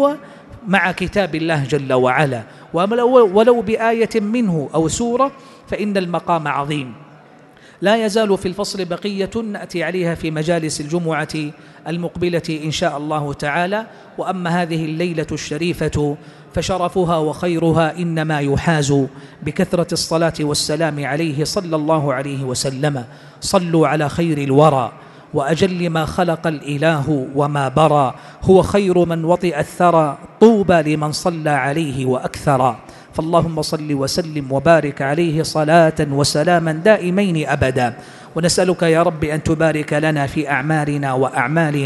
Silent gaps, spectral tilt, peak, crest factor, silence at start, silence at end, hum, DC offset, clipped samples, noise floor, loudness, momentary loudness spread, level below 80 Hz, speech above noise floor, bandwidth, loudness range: none; -5.5 dB/octave; 0 dBFS; 18 dB; 0 s; 0 s; none; under 0.1%; under 0.1%; -44 dBFS; -17 LUFS; 9 LU; -44 dBFS; 27 dB; 12 kHz; 6 LU